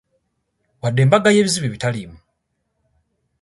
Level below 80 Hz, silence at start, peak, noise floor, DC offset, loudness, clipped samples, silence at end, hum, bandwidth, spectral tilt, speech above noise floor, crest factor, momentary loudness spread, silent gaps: -54 dBFS; 0.85 s; 0 dBFS; -72 dBFS; under 0.1%; -17 LUFS; under 0.1%; 1.25 s; none; 11.5 kHz; -5 dB/octave; 56 dB; 20 dB; 15 LU; none